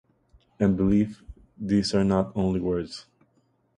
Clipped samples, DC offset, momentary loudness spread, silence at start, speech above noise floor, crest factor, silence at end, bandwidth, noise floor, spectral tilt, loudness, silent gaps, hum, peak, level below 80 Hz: under 0.1%; under 0.1%; 12 LU; 0.6 s; 44 dB; 16 dB; 0.75 s; 10 kHz; -67 dBFS; -7 dB/octave; -25 LUFS; none; none; -10 dBFS; -46 dBFS